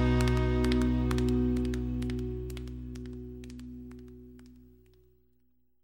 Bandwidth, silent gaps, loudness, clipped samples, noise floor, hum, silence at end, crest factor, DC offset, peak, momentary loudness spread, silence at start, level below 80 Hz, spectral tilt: 16 kHz; none; -31 LUFS; under 0.1%; -74 dBFS; none; 1.2 s; 20 dB; under 0.1%; -12 dBFS; 20 LU; 0 s; -36 dBFS; -7 dB/octave